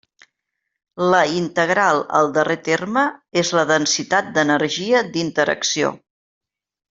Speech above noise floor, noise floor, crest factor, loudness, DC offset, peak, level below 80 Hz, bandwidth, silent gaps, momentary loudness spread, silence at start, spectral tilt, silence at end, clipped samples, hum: 60 dB; -78 dBFS; 18 dB; -18 LUFS; under 0.1%; -2 dBFS; -62 dBFS; 8 kHz; none; 4 LU; 0.95 s; -3.5 dB/octave; 0.95 s; under 0.1%; none